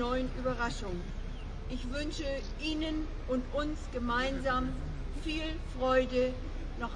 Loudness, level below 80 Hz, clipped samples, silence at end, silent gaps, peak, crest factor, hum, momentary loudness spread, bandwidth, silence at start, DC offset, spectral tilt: -35 LUFS; -38 dBFS; under 0.1%; 0 s; none; -16 dBFS; 18 dB; none; 11 LU; 10 kHz; 0 s; under 0.1%; -5.5 dB/octave